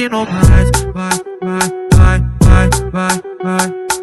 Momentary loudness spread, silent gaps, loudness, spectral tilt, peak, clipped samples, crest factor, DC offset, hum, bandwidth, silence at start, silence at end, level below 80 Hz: 9 LU; none; -13 LUFS; -5.5 dB/octave; 0 dBFS; 1%; 12 dB; under 0.1%; none; 12.5 kHz; 0 s; 0 s; -16 dBFS